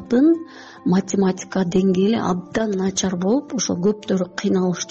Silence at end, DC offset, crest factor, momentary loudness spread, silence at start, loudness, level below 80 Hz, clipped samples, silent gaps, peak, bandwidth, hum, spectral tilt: 0 s; under 0.1%; 12 dB; 6 LU; 0 s; -20 LUFS; -54 dBFS; under 0.1%; none; -8 dBFS; 8 kHz; none; -6.5 dB/octave